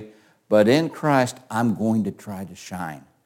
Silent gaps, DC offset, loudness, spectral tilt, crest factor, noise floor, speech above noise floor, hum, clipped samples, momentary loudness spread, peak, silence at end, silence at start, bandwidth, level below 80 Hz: none; under 0.1%; -22 LUFS; -6 dB/octave; 18 dB; -46 dBFS; 24 dB; none; under 0.1%; 17 LU; -4 dBFS; 0.25 s; 0 s; 17 kHz; -66 dBFS